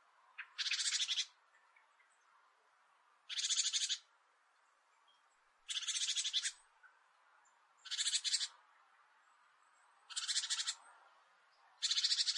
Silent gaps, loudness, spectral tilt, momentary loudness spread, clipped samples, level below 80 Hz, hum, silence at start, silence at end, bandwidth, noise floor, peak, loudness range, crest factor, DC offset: none; -37 LUFS; 9 dB/octave; 12 LU; under 0.1%; under -90 dBFS; none; 0.4 s; 0 s; 11.5 kHz; -74 dBFS; -22 dBFS; 3 LU; 22 dB; under 0.1%